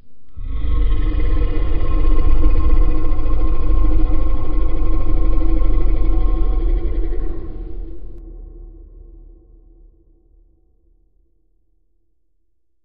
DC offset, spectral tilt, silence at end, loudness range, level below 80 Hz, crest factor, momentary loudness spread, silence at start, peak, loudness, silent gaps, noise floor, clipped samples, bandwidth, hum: under 0.1%; -8.5 dB/octave; 4.15 s; 14 LU; -16 dBFS; 12 dB; 18 LU; 0.05 s; -2 dBFS; -22 LUFS; none; -71 dBFS; under 0.1%; 3.3 kHz; none